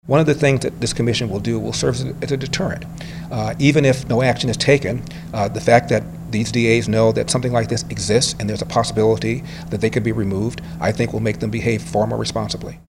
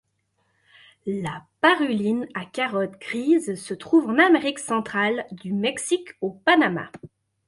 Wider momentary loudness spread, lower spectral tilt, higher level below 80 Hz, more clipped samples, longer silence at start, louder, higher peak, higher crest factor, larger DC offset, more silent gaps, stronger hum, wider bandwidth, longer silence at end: second, 9 LU vs 13 LU; about the same, -5.5 dB/octave vs -4.5 dB/octave; first, -40 dBFS vs -68 dBFS; neither; second, 0.05 s vs 1.05 s; first, -19 LUFS vs -23 LUFS; first, 0 dBFS vs -4 dBFS; about the same, 18 dB vs 20 dB; neither; neither; neither; first, 16 kHz vs 11.5 kHz; second, 0.1 s vs 0.4 s